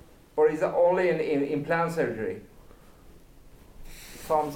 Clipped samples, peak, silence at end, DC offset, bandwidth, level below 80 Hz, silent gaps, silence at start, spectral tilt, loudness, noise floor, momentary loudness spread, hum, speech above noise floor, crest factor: under 0.1%; -12 dBFS; 0 s; under 0.1%; 17 kHz; -52 dBFS; none; 0.35 s; -6.5 dB/octave; -26 LUFS; -51 dBFS; 19 LU; none; 25 dB; 16 dB